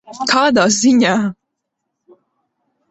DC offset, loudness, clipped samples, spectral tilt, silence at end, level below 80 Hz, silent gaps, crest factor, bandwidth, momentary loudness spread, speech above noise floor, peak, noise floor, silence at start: under 0.1%; -13 LUFS; under 0.1%; -3.5 dB/octave; 1.55 s; -58 dBFS; none; 16 dB; 8.2 kHz; 7 LU; 62 dB; -2 dBFS; -76 dBFS; 0.1 s